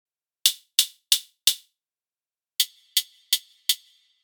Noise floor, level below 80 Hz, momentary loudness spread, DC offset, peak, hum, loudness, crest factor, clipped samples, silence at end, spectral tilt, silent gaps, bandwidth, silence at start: under -90 dBFS; under -90 dBFS; 5 LU; under 0.1%; 0 dBFS; none; -23 LUFS; 28 dB; under 0.1%; 0.5 s; 10 dB/octave; none; over 20 kHz; 0.45 s